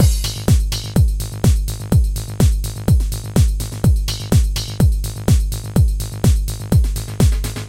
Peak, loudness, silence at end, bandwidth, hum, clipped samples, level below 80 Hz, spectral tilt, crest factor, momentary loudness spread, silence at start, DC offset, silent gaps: 0 dBFS; -18 LUFS; 0 s; 16.5 kHz; none; under 0.1%; -18 dBFS; -6 dB/octave; 16 dB; 3 LU; 0 s; 0.2%; none